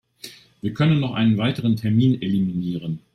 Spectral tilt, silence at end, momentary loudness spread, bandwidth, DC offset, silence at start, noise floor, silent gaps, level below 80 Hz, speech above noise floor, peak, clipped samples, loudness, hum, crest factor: -8 dB/octave; 0.15 s; 15 LU; 14 kHz; under 0.1%; 0.25 s; -43 dBFS; none; -56 dBFS; 23 dB; -8 dBFS; under 0.1%; -21 LUFS; none; 14 dB